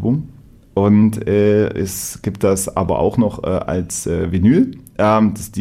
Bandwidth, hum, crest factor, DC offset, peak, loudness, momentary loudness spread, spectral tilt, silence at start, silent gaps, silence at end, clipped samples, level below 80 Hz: 16 kHz; none; 14 dB; under 0.1%; -2 dBFS; -17 LUFS; 9 LU; -6.5 dB/octave; 0 s; none; 0 s; under 0.1%; -40 dBFS